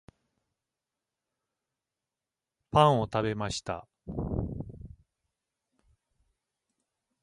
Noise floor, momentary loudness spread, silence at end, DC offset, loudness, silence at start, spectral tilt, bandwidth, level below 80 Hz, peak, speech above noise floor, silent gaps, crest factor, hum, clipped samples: under -90 dBFS; 18 LU; 2.35 s; under 0.1%; -29 LUFS; 2.75 s; -6 dB/octave; 11.5 kHz; -50 dBFS; -6 dBFS; over 64 dB; none; 28 dB; none; under 0.1%